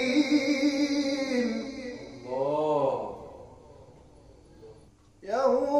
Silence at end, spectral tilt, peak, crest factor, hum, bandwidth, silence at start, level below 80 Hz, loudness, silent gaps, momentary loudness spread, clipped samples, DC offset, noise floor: 0 s; -4.5 dB/octave; -12 dBFS; 16 dB; none; 11.5 kHz; 0 s; -60 dBFS; -28 LUFS; none; 18 LU; under 0.1%; under 0.1%; -56 dBFS